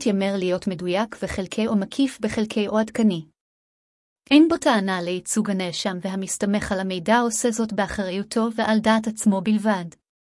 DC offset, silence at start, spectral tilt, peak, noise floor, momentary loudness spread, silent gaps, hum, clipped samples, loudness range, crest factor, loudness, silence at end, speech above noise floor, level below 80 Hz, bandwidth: under 0.1%; 0 s; -4.5 dB/octave; -4 dBFS; under -90 dBFS; 8 LU; 3.41-4.16 s; none; under 0.1%; 2 LU; 18 dB; -22 LUFS; 0.35 s; over 68 dB; -52 dBFS; 12 kHz